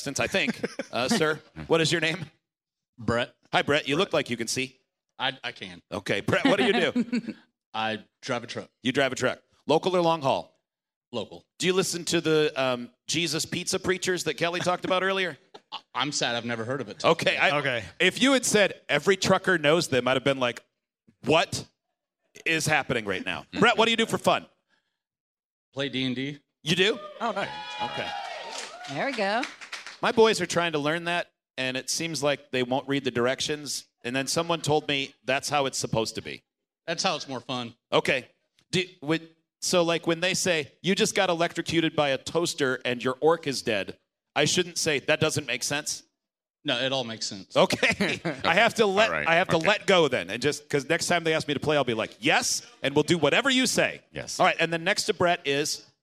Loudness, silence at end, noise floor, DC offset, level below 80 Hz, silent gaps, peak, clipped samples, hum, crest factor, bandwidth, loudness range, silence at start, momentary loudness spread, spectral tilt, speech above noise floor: -26 LUFS; 0.2 s; -89 dBFS; under 0.1%; -64 dBFS; 2.89-2.93 s, 7.66-7.72 s, 10.96-11.01 s, 11.07-11.11 s, 25.20-25.35 s, 25.45-25.72 s, 46.50-46.54 s; -4 dBFS; under 0.1%; none; 22 dB; 15.5 kHz; 5 LU; 0 s; 12 LU; -3.5 dB/octave; 63 dB